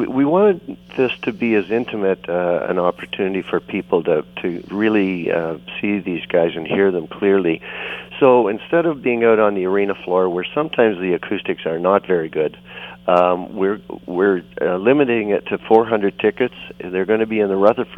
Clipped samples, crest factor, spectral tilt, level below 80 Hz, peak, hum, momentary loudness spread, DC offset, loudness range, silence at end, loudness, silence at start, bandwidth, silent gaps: under 0.1%; 18 dB; -8.5 dB/octave; -56 dBFS; 0 dBFS; 60 Hz at -45 dBFS; 9 LU; under 0.1%; 3 LU; 0 s; -18 LUFS; 0 s; 5 kHz; none